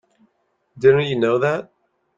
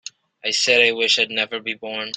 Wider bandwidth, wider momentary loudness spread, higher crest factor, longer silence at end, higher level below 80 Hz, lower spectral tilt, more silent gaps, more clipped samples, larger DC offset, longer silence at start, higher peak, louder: second, 7.6 kHz vs 9.4 kHz; second, 7 LU vs 13 LU; about the same, 18 dB vs 20 dB; first, 0.55 s vs 0 s; first, -60 dBFS vs -72 dBFS; first, -7 dB/octave vs -0.5 dB/octave; neither; neither; neither; first, 0.75 s vs 0.45 s; about the same, -2 dBFS vs -2 dBFS; about the same, -18 LUFS vs -18 LUFS